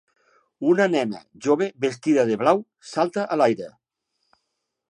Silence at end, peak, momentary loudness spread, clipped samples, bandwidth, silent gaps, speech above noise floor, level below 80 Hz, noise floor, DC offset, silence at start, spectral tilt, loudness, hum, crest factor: 1.25 s; -4 dBFS; 10 LU; under 0.1%; 10.5 kHz; none; 57 dB; -74 dBFS; -78 dBFS; under 0.1%; 0.6 s; -6 dB/octave; -22 LUFS; none; 20 dB